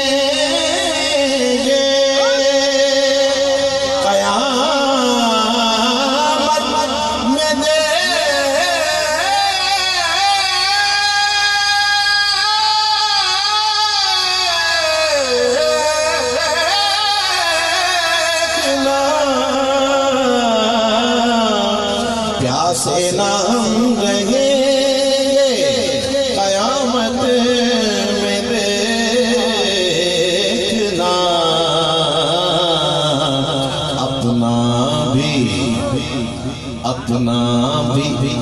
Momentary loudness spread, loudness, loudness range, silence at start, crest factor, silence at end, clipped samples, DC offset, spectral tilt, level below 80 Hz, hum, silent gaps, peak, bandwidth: 4 LU; -14 LUFS; 3 LU; 0 s; 12 dB; 0 s; under 0.1%; under 0.1%; -3 dB/octave; -42 dBFS; none; none; -4 dBFS; 13.5 kHz